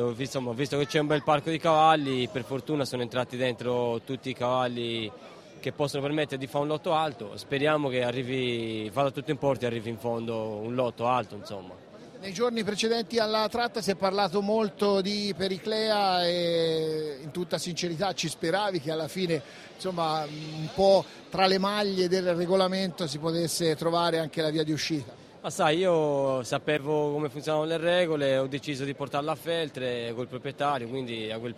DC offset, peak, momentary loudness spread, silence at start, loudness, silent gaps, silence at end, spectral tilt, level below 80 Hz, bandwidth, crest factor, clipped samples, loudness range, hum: under 0.1%; -8 dBFS; 10 LU; 0 s; -28 LUFS; none; 0 s; -5 dB/octave; -64 dBFS; 15.5 kHz; 20 dB; under 0.1%; 4 LU; none